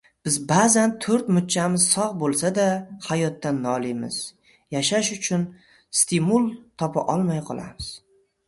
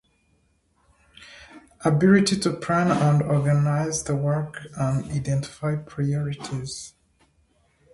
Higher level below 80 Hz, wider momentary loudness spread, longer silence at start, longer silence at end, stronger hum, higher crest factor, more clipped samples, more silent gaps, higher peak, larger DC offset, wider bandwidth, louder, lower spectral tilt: second, -58 dBFS vs -52 dBFS; about the same, 12 LU vs 14 LU; second, 0.25 s vs 1.2 s; second, 0.5 s vs 1.05 s; neither; about the same, 18 dB vs 20 dB; neither; neither; about the same, -6 dBFS vs -4 dBFS; neither; about the same, 12 kHz vs 11.5 kHz; about the same, -22 LUFS vs -23 LUFS; second, -4 dB/octave vs -6 dB/octave